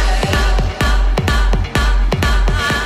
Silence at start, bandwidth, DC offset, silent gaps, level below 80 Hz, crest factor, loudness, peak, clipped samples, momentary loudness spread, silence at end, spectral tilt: 0 s; 14.5 kHz; under 0.1%; none; -14 dBFS; 10 dB; -16 LUFS; -2 dBFS; under 0.1%; 1 LU; 0 s; -5 dB/octave